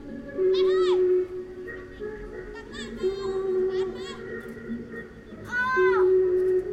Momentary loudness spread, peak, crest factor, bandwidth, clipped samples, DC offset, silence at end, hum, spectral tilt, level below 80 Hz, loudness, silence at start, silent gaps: 17 LU; -12 dBFS; 14 dB; 8.4 kHz; under 0.1%; under 0.1%; 0 s; none; -6 dB/octave; -52 dBFS; -25 LUFS; 0 s; none